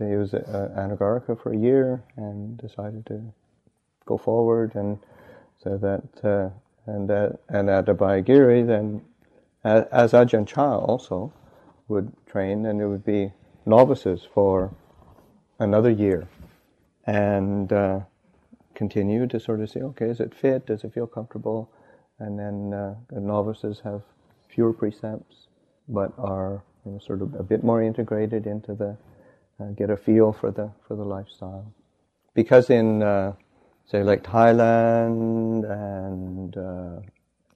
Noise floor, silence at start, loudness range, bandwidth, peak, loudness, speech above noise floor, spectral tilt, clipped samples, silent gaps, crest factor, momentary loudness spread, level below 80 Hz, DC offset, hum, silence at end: -69 dBFS; 0 s; 9 LU; 8.2 kHz; -2 dBFS; -23 LUFS; 46 dB; -9 dB/octave; under 0.1%; none; 20 dB; 18 LU; -58 dBFS; under 0.1%; none; 0.5 s